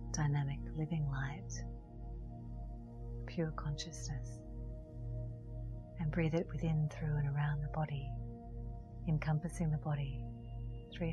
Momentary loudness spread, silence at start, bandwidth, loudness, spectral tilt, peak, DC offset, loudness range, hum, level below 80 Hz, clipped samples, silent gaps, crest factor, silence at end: 13 LU; 0 s; 11 kHz; -41 LUFS; -6.5 dB/octave; -20 dBFS; under 0.1%; 6 LU; none; -48 dBFS; under 0.1%; none; 18 dB; 0 s